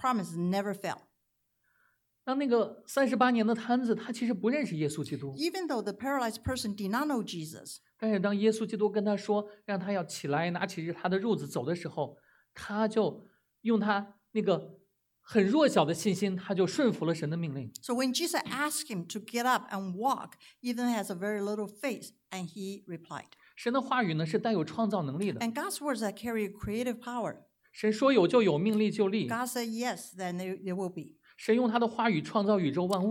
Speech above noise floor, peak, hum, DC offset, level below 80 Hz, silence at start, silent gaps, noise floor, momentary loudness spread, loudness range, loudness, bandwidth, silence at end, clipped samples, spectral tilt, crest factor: 48 dB; -10 dBFS; none; under 0.1%; -66 dBFS; 0 s; none; -79 dBFS; 12 LU; 5 LU; -31 LUFS; 17 kHz; 0 s; under 0.1%; -5.5 dB/octave; 20 dB